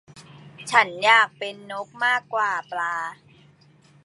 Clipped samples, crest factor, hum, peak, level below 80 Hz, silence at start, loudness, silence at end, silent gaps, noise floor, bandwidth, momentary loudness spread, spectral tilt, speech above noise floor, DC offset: under 0.1%; 22 dB; none; -2 dBFS; -74 dBFS; 0.15 s; -21 LUFS; 0.9 s; none; -55 dBFS; 11.5 kHz; 18 LU; -1.5 dB/octave; 33 dB; under 0.1%